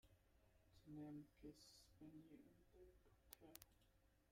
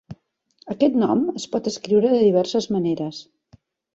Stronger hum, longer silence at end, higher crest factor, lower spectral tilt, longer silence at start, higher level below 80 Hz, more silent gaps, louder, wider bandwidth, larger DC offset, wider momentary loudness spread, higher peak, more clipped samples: neither; second, 0 s vs 0.7 s; first, 34 dB vs 16 dB; about the same, -5 dB/octave vs -6 dB/octave; about the same, 0.05 s vs 0.1 s; second, -78 dBFS vs -62 dBFS; neither; second, -63 LUFS vs -21 LUFS; first, 15.5 kHz vs 8 kHz; neither; about the same, 10 LU vs 12 LU; second, -32 dBFS vs -6 dBFS; neither